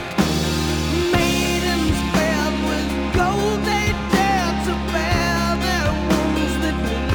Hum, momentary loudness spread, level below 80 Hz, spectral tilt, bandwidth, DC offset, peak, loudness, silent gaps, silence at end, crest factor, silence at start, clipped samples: none; 4 LU; -30 dBFS; -5 dB/octave; over 20 kHz; under 0.1%; -4 dBFS; -20 LUFS; none; 0 s; 16 dB; 0 s; under 0.1%